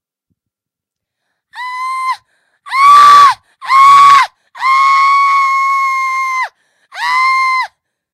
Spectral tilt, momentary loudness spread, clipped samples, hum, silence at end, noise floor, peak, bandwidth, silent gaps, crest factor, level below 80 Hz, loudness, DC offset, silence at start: 1 dB/octave; 17 LU; 1%; none; 0.45 s; -83 dBFS; 0 dBFS; 15 kHz; none; 10 dB; -62 dBFS; -9 LUFS; under 0.1%; 1.55 s